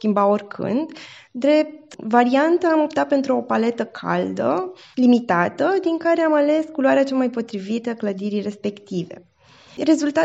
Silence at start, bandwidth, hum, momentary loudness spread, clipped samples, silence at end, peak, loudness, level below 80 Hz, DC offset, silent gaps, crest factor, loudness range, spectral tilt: 0 s; 8 kHz; none; 12 LU; under 0.1%; 0 s; -2 dBFS; -20 LUFS; -70 dBFS; under 0.1%; none; 18 dB; 4 LU; -6 dB/octave